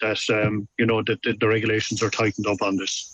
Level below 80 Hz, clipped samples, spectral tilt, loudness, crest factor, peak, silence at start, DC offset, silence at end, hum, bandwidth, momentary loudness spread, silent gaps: -58 dBFS; under 0.1%; -4.5 dB/octave; -23 LUFS; 16 dB; -8 dBFS; 0 s; under 0.1%; 0 s; none; 8.8 kHz; 3 LU; none